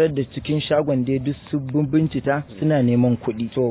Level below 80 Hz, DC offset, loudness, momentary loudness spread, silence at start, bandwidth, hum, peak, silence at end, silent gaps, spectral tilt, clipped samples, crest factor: -48 dBFS; under 0.1%; -21 LUFS; 7 LU; 0 s; 4 kHz; none; -6 dBFS; 0 s; none; -12 dB/octave; under 0.1%; 14 dB